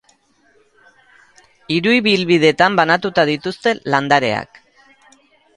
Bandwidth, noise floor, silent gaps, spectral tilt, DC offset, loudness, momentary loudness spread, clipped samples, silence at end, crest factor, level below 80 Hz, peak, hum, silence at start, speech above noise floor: 11 kHz; -56 dBFS; none; -5 dB/octave; under 0.1%; -15 LUFS; 8 LU; under 0.1%; 1.1 s; 18 dB; -58 dBFS; 0 dBFS; none; 1.7 s; 41 dB